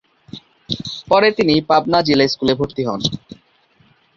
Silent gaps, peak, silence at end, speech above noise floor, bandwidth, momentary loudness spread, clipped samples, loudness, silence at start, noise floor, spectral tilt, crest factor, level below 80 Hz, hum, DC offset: none; -2 dBFS; 1 s; 40 dB; 7.6 kHz; 23 LU; under 0.1%; -17 LUFS; 0.35 s; -56 dBFS; -5.5 dB/octave; 16 dB; -50 dBFS; none; under 0.1%